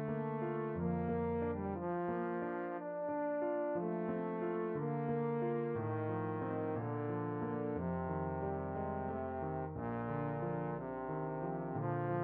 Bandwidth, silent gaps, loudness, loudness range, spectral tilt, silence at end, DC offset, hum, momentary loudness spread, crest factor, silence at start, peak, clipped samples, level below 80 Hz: 3.8 kHz; none; -39 LUFS; 2 LU; -9 dB/octave; 0 s; under 0.1%; none; 4 LU; 12 dB; 0 s; -26 dBFS; under 0.1%; -62 dBFS